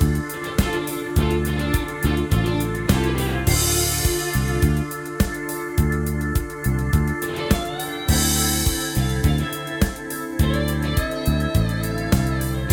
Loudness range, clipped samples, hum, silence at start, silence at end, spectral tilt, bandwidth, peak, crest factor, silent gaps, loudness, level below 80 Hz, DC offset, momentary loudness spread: 2 LU; under 0.1%; none; 0 s; 0 s; -4.5 dB/octave; 19 kHz; -2 dBFS; 18 dB; none; -22 LUFS; -28 dBFS; under 0.1%; 6 LU